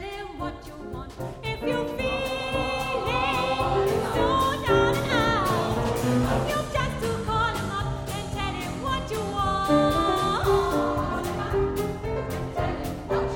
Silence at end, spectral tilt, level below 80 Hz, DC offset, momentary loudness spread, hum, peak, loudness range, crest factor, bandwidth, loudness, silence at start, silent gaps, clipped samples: 0 s; -5.5 dB/octave; -38 dBFS; under 0.1%; 10 LU; none; -8 dBFS; 4 LU; 18 dB; 19.5 kHz; -26 LUFS; 0 s; none; under 0.1%